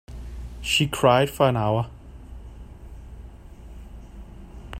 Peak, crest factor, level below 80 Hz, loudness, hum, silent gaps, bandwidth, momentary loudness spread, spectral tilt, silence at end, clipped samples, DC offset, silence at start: -4 dBFS; 22 dB; -40 dBFS; -22 LUFS; none; none; 16 kHz; 25 LU; -5 dB/octave; 0 s; under 0.1%; under 0.1%; 0.1 s